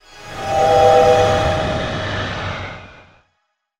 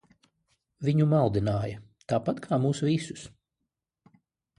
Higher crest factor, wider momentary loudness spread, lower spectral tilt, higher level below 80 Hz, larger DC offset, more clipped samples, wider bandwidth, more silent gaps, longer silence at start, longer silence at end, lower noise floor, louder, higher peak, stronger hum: about the same, 16 dB vs 18 dB; about the same, 18 LU vs 17 LU; second, -5 dB/octave vs -7.5 dB/octave; first, -38 dBFS vs -56 dBFS; neither; neither; first, 15 kHz vs 11 kHz; neither; second, 0.15 s vs 0.8 s; second, 0.9 s vs 1.3 s; second, -70 dBFS vs -84 dBFS; first, -16 LUFS vs -27 LUFS; first, 0 dBFS vs -10 dBFS; neither